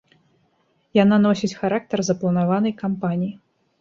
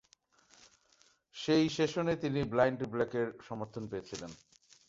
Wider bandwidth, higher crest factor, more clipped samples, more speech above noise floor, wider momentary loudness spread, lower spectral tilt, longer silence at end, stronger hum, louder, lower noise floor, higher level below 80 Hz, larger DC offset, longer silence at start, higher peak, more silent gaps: about the same, 7.6 kHz vs 7.8 kHz; about the same, 18 dB vs 22 dB; neither; first, 45 dB vs 36 dB; second, 8 LU vs 15 LU; about the same, -6.5 dB/octave vs -6 dB/octave; about the same, 0.45 s vs 0.55 s; neither; first, -21 LUFS vs -33 LUFS; second, -65 dBFS vs -69 dBFS; about the same, -62 dBFS vs -64 dBFS; neither; second, 0.95 s vs 1.35 s; first, -4 dBFS vs -14 dBFS; neither